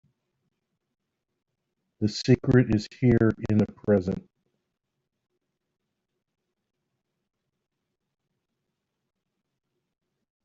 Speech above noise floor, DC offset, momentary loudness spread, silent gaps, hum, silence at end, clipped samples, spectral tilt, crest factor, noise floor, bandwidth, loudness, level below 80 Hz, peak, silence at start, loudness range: 60 dB; under 0.1%; 10 LU; none; none; 6.25 s; under 0.1%; -7.5 dB/octave; 22 dB; -82 dBFS; 7.8 kHz; -24 LUFS; -52 dBFS; -8 dBFS; 2 s; 8 LU